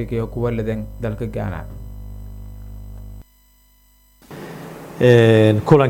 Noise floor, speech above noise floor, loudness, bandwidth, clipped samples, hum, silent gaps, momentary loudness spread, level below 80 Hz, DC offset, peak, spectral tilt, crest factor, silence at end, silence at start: -54 dBFS; 38 dB; -17 LUFS; 17 kHz; under 0.1%; 50 Hz at -40 dBFS; none; 25 LU; -38 dBFS; under 0.1%; 0 dBFS; -8 dB/octave; 20 dB; 0 s; 0 s